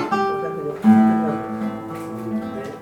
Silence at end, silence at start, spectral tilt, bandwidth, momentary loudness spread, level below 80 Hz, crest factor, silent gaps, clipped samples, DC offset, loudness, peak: 0 s; 0 s; -8 dB/octave; 9.4 kHz; 15 LU; -60 dBFS; 16 dB; none; under 0.1%; under 0.1%; -21 LUFS; -4 dBFS